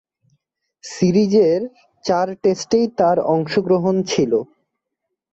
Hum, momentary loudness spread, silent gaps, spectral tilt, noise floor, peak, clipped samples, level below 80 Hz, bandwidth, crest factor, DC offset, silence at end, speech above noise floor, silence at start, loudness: none; 15 LU; none; -6 dB/octave; -79 dBFS; -4 dBFS; under 0.1%; -58 dBFS; 8.2 kHz; 14 dB; under 0.1%; 0.9 s; 62 dB; 0.85 s; -18 LUFS